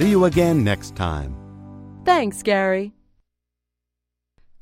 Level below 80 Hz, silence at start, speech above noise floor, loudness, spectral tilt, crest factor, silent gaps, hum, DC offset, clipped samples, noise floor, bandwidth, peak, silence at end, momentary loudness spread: -42 dBFS; 0 s; 63 dB; -20 LUFS; -6 dB/octave; 18 dB; none; 60 Hz at -60 dBFS; under 0.1%; under 0.1%; -82 dBFS; 16 kHz; -4 dBFS; 1.7 s; 22 LU